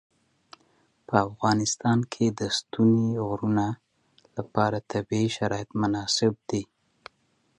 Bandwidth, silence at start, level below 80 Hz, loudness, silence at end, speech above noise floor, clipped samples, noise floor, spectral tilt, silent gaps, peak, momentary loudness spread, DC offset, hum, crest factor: 11 kHz; 1.1 s; -58 dBFS; -26 LUFS; 0.95 s; 44 dB; under 0.1%; -69 dBFS; -5 dB/octave; none; -6 dBFS; 9 LU; under 0.1%; none; 22 dB